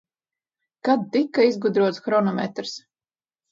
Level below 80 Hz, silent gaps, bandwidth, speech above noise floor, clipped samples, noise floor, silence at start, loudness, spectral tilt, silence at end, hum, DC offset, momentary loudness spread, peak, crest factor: -74 dBFS; none; 7.6 kHz; over 69 dB; under 0.1%; under -90 dBFS; 0.85 s; -22 LUFS; -6 dB/octave; 0.75 s; none; under 0.1%; 12 LU; -6 dBFS; 18 dB